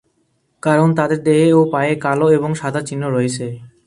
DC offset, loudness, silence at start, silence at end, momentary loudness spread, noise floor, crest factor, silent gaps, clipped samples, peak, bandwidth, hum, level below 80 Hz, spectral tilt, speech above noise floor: under 0.1%; -16 LUFS; 0.65 s; 0.2 s; 9 LU; -64 dBFS; 16 dB; none; under 0.1%; 0 dBFS; 11.5 kHz; none; -58 dBFS; -6.5 dB/octave; 49 dB